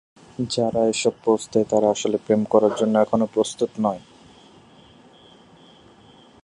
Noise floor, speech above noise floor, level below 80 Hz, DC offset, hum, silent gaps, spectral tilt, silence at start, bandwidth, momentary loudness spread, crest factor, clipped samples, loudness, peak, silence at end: -50 dBFS; 30 dB; -60 dBFS; under 0.1%; none; none; -5 dB/octave; 0.4 s; 11 kHz; 7 LU; 20 dB; under 0.1%; -21 LUFS; -2 dBFS; 2.45 s